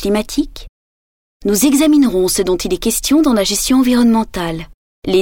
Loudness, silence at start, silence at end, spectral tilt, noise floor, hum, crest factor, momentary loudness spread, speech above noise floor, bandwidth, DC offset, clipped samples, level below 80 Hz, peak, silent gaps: -14 LUFS; 0 s; 0 s; -4 dB/octave; under -90 dBFS; none; 12 dB; 12 LU; over 77 dB; 19.5 kHz; under 0.1%; under 0.1%; -34 dBFS; -2 dBFS; 0.69-1.40 s, 4.74-5.02 s